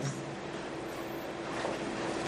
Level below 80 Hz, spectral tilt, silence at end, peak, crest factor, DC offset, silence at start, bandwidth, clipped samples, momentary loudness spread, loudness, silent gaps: -62 dBFS; -5 dB/octave; 0 s; -22 dBFS; 16 dB; under 0.1%; 0 s; 15.5 kHz; under 0.1%; 4 LU; -38 LUFS; none